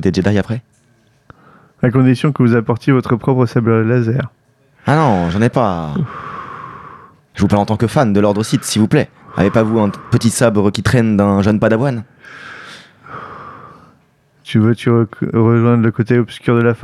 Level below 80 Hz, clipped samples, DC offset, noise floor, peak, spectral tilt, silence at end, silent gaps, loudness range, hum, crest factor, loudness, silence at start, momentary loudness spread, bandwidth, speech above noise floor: -44 dBFS; under 0.1%; under 0.1%; -54 dBFS; 0 dBFS; -7 dB/octave; 0 s; none; 4 LU; none; 14 dB; -14 LUFS; 0 s; 19 LU; 13 kHz; 41 dB